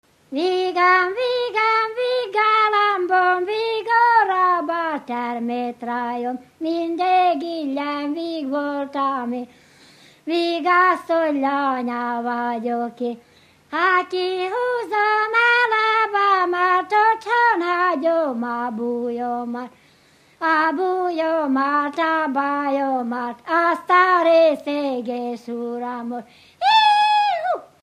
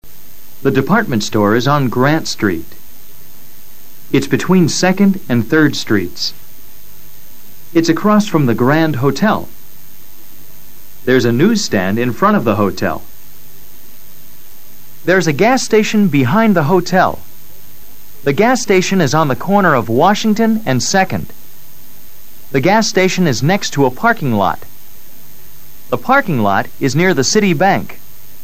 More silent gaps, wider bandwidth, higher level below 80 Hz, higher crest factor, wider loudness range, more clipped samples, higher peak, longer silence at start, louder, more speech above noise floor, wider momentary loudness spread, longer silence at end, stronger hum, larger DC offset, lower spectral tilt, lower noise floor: neither; second, 14 kHz vs 16 kHz; second, -74 dBFS vs -48 dBFS; about the same, 16 dB vs 16 dB; about the same, 5 LU vs 3 LU; neither; second, -4 dBFS vs 0 dBFS; first, 0.3 s vs 0 s; second, -20 LUFS vs -13 LUFS; first, 34 dB vs 28 dB; first, 12 LU vs 8 LU; second, 0.15 s vs 0.5 s; neither; second, under 0.1% vs 7%; about the same, -4 dB/octave vs -5 dB/octave; first, -55 dBFS vs -40 dBFS